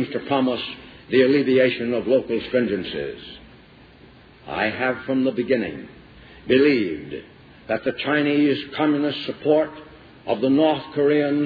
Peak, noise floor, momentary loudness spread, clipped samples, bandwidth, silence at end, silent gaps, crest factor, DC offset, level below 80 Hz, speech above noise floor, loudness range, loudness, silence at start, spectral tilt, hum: -6 dBFS; -48 dBFS; 15 LU; under 0.1%; 5 kHz; 0 s; none; 16 dB; under 0.1%; -56 dBFS; 27 dB; 5 LU; -21 LUFS; 0 s; -8.5 dB/octave; none